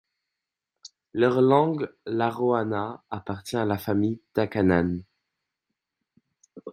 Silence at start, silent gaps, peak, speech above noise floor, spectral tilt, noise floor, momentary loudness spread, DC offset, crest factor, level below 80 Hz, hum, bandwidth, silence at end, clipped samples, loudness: 0.85 s; none; -6 dBFS; 62 dB; -7.5 dB/octave; -86 dBFS; 14 LU; under 0.1%; 20 dB; -64 dBFS; none; 15 kHz; 0 s; under 0.1%; -25 LUFS